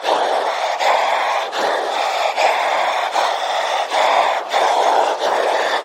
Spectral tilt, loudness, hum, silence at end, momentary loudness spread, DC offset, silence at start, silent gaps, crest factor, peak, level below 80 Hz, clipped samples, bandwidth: 0 dB/octave; -17 LUFS; none; 0 s; 4 LU; under 0.1%; 0 s; none; 16 dB; -2 dBFS; -80 dBFS; under 0.1%; 16.5 kHz